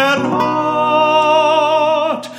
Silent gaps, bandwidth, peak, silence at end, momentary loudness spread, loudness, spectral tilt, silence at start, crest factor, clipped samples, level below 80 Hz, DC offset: none; 14 kHz; 0 dBFS; 0 s; 4 LU; -13 LUFS; -4.5 dB/octave; 0 s; 14 dB; under 0.1%; -62 dBFS; under 0.1%